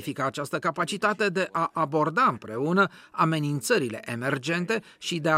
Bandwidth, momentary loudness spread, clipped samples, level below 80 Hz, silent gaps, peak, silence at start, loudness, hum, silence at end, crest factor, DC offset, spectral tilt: 16 kHz; 6 LU; under 0.1%; -74 dBFS; none; -8 dBFS; 0 s; -26 LUFS; none; 0 s; 18 dB; under 0.1%; -5 dB/octave